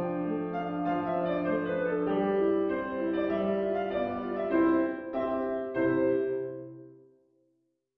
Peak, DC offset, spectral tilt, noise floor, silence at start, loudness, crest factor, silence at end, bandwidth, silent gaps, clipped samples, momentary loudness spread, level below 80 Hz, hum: -14 dBFS; under 0.1%; -10 dB/octave; -75 dBFS; 0 s; -30 LUFS; 16 dB; 1.05 s; 4.8 kHz; none; under 0.1%; 6 LU; -62 dBFS; none